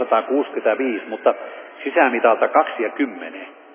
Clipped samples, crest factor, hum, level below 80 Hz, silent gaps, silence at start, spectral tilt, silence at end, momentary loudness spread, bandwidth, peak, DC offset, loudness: under 0.1%; 18 dB; none; under -90 dBFS; none; 0 s; -7 dB/octave; 0.2 s; 16 LU; 3.6 kHz; -2 dBFS; under 0.1%; -20 LUFS